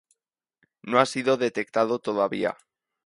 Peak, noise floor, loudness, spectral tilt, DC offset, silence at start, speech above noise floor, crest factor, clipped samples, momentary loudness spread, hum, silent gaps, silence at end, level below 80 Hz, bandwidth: -4 dBFS; -80 dBFS; -25 LUFS; -4.5 dB/octave; under 0.1%; 0.85 s; 56 dB; 22 dB; under 0.1%; 8 LU; none; none; 0.5 s; -72 dBFS; 11.5 kHz